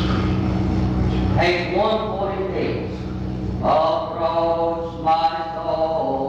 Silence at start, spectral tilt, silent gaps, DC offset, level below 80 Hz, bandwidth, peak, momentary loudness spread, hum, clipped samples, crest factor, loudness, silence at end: 0 s; -7.5 dB/octave; none; under 0.1%; -32 dBFS; 7.8 kHz; -8 dBFS; 7 LU; none; under 0.1%; 14 dB; -21 LUFS; 0 s